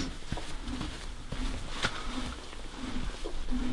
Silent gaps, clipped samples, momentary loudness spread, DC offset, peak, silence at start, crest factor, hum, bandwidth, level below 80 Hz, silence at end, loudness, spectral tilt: none; under 0.1%; 8 LU; under 0.1%; -16 dBFS; 0 s; 18 dB; none; 11.5 kHz; -38 dBFS; 0 s; -38 LUFS; -4 dB/octave